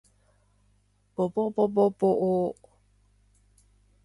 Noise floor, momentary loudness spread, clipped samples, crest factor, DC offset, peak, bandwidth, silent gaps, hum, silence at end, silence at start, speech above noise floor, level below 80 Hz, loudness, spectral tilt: -66 dBFS; 12 LU; under 0.1%; 18 dB; under 0.1%; -12 dBFS; 11.5 kHz; none; 50 Hz at -50 dBFS; 1.55 s; 1.2 s; 42 dB; -66 dBFS; -26 LUFS; -9.5 dB/octave